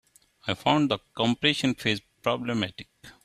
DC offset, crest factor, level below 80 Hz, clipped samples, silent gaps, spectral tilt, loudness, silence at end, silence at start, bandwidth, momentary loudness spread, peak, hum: under 0.1%; 22 dB; -62 dBFS; under 0.1%; none; -5 dB/octave; -26 LUFS; 0.15 s; 0.45 s; 14.5 kHz; 10 LU; -6 dBFS; none